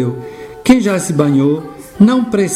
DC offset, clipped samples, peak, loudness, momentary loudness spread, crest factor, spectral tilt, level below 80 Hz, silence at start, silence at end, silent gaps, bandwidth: under 0.1%; 0.4%; 0 dBFS; -13 LUFS; 15 LU; 14 dB; -6 dB/octave; -44 dBFS; 0 s; 0 s; none; 15.5 kHz